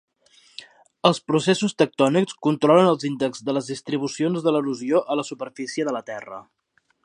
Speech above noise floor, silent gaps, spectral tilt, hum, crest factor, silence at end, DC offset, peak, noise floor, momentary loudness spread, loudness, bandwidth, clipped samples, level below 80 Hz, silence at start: 35 dB; none; -5.5 dB/octave; none; 20 dB; 0.6 s; under 0.1%; -2 dBFS; -57 dBFS; 18 LU; -22 LUFS; 11 kHz; under 0.1%; -72 dBFS; 0.6 s